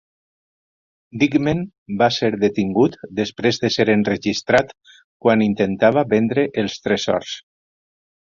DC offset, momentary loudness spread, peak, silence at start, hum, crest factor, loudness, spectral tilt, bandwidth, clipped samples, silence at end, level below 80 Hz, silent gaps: under 0.1%; 8 LU; -2 dBFS; 1.15 s; none; 18 dB; -19 LUFS; -5.5 dB/octave; 7.6 kHz; under 0.1%; 0.9 s; -54 dBFS; 1.78-1.86 s, 5.04-5.20 s